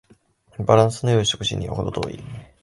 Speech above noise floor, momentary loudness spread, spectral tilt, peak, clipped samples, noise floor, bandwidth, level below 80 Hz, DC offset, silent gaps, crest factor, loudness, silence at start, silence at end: 36 dB; 19 LU; -5 dB/octave; 0 dBFS; under 0.1%; -56 dBFS; 11.5 kHz; -44 dBFS; under 0.1%; none; 22 dB; -21 LUFS; 0.6 s; 0.2 s